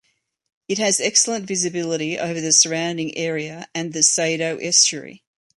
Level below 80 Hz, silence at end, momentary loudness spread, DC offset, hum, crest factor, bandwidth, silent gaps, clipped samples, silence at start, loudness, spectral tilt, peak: -70 dBFS; 0.4 s; 13 LU; under 0.1%; none; 20 dB; 11.5 kHz; none; under 0.1%; 0.7 s; -19 LUFS; -1.5 dB/octave; -2 dBFS